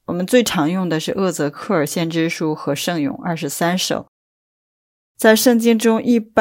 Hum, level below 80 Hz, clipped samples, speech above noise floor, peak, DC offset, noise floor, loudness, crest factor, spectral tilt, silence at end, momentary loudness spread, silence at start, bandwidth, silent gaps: none; -60 dBFS; under 0.1%; over 73 dB; 0 dBFS; under 0.1%; under -90 dBFS; -18 LUFS; 18 dB; -4.5 dB/octave; 0 s; 9 LU; 0.1 s; 16.5 kHz; 4.08-5.15 s